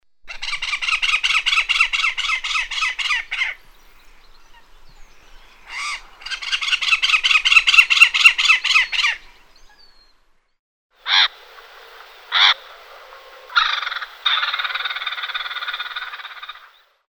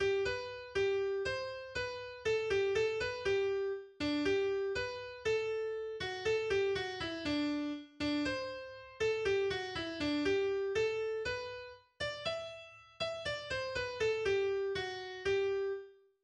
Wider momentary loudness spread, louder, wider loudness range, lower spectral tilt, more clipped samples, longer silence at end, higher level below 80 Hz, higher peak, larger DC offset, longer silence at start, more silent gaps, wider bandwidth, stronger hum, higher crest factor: first, 18 LU vs 8 LU; first, -16 LUFS vs -36 LUFS; first, 12 LU vs 3 LU; second, 3.5 dB/octave vs -4.5 dB/octave; neither; first, 0.5 s vs 0.3 s; first, -48 dBFS vs -60 dBFS; first, 0 dBFS vs -22 dBFS; neither; first, 0.25 s vs 0 s; first, 10.59-10.90 s vs none; first, over 20 kHz vs 9.8 kHz; neither; first, 20 dB vs 14 dB